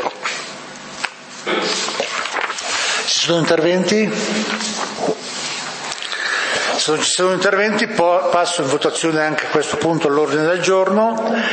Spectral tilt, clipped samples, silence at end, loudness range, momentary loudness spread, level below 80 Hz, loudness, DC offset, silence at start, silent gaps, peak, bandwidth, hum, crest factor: -3 dB/octave; under 0.1%; 0 s; 3 LU; 9 LU; -62 dBFS; -17 LUFS; under 0.1%; 0 s; none; 0 dBFS; 8.8 kHz; none; 18 dB